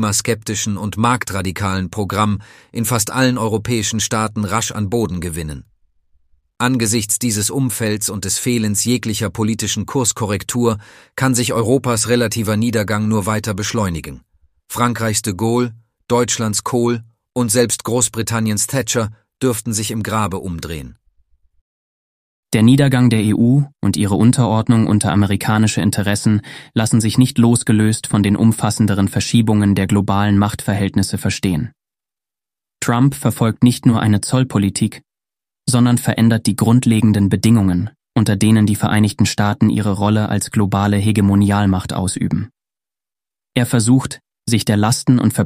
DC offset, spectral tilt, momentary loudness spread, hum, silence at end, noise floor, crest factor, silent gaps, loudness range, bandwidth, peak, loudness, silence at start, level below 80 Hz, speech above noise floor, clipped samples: under 0.1%; -5 dB/octave; 8 LU; none; 0 s; under -90 dBFS; 16 dB; 21.61-22.43 s; 5 LU; 15.5 kHz; 0 dBFS; -16 LUFS; 0 s; -46 dBFS; over 74 dB; under 0.1%